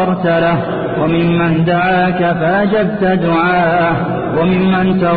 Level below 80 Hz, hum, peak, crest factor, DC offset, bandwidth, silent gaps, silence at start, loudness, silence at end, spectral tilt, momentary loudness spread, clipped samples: -40 dBFS; none; -4 dBFS; 10 dB; under 0.1%; 4.8 kHz; none; 0 s; -13 LUFS; 0 s; -13 dB/octave; 3 LU; under 0.1%